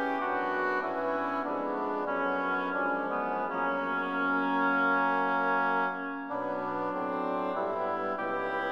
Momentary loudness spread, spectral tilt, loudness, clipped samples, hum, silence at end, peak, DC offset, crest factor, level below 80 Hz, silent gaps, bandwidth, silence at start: 6 LU; -7 dB/octave; -30 LUFS; under 0.1%; none; 0 s; -18 dBFS; 0.1%; 14 dB; -72 dBFS; none; 6.8 kHz; 0 s